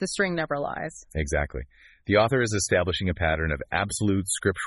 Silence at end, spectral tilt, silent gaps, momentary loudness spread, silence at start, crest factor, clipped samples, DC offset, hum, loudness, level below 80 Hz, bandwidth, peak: 0 s; -4.5 dB/octave; none; 11 LU; 0 s; 18 dB; under 0.1%; under 0.1%; none; -26 LUFS; -40 dBFS; 11.5 kHz; -8 dBFS